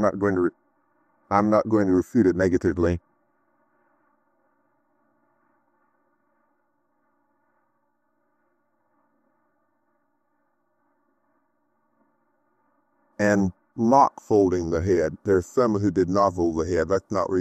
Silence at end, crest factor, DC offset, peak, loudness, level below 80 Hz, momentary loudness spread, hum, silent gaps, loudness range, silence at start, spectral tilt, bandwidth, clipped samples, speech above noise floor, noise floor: 0 s; 20 dB; under 0.1%; -4 dBFS; -22 LUFS; -56 dBFS; 5 LU; none; none; 9 LU; 0 s; -7.5 dB/octave; 13 kHz; under 0.1%; 52 dB; -73 dBFS